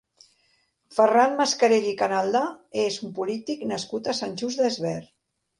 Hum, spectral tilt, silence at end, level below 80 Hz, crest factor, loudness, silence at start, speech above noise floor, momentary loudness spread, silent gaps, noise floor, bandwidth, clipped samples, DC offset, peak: none; -3.5 dB/octave; 0.55 s; -72 dBFS; 20 dB; -24 LUFS; 0.9 s; 44 dB; 10 LU; none; -68 dBFS; 11.5 kHz; under 0.1%; under 0.1%; -6 dBFS